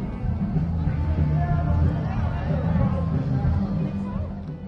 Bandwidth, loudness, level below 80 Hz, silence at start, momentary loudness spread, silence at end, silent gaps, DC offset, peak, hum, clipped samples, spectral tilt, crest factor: 5.6 kHz; -25 LUFS; -32 dBFS; 0 s; 6 LU; 0 s; none; under 0.1%; -10 dBFS; none; under 0.1%; -10.5 dB/octave; 14 dB